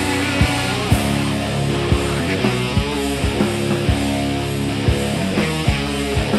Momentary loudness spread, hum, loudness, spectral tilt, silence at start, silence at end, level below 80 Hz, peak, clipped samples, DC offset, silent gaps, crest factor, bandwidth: 3 LU; none; -19 LUFS; -5 dB/octave; 0 s; 0 s; -28 dBFS; -2 dBFS; under 0.1%; under 0.1%; none; 16 dB; 15 kHz